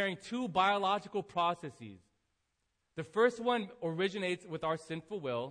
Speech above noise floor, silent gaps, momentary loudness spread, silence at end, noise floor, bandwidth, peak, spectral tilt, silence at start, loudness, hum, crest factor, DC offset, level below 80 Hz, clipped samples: 47 dB; none; 15 LU; 0 s; -82 dBFS; 10 kHz; -14 dBFS; -5 dB/octave; 0 s; -34 LUFS; none; 20 dB; under 0.1%; -74 dBFS; under 0.1%